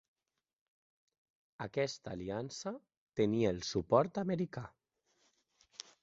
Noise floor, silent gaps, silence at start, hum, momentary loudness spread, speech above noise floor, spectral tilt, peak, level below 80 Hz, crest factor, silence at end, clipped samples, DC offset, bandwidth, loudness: under -90 dBFS; 2.97-3.07 s; 1.6 s; none; 20 LU; over 55 dB; -5.5 dB/octave; -14 dBFS; -66 dBFS; 24 dB; 1.35 s; under 0.1%; under 0.1%; 7.6 kHz; -36 LUFS